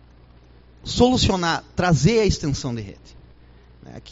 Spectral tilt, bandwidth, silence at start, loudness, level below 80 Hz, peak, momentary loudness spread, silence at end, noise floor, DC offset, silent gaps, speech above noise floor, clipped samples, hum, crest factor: -5 dB/octave; 8 kHz; 0.85 s; -20 LUFS; -38 dBFS; -2 dBFS; 19 LU; 0 s; -49 dBFS; under 0.1%; none; 29 dB; under 0.1%; none; 20 dB